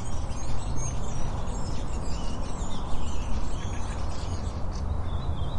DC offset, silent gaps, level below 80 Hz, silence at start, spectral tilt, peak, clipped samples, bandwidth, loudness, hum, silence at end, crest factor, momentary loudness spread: under 0.1%; none; -32 dBFS; 0 s; -5.5 dB/octave; -12 dBFS; under 0.1%; 10.5 kHz; -34 LUFS; none; 0 s; 12 dB; 2 LU